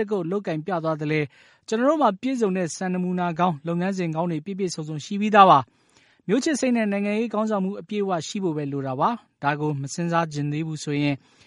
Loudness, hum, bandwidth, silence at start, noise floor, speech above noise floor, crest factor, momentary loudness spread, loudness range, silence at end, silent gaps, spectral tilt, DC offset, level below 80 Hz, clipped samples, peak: -24 LUFS; none; 11.5 kHz; 0 s; -60 dBFS; 36 dB; 22 dB; 8 LU; 5 LU; 0.3 s; none; -6 dB/octave; under 0.1%; -70 dBFS; under 0.1%; -2 dBFS